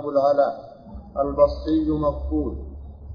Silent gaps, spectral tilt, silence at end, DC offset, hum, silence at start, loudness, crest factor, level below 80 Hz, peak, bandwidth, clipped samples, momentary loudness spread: none; -9.5 dB/octave; 0 s; under 0.1%; none; 0 s; -22 LUFS; 18 dB; -36 dBFS; -4 dBFS; 5.2 kHz; under 0.1%; 20 LU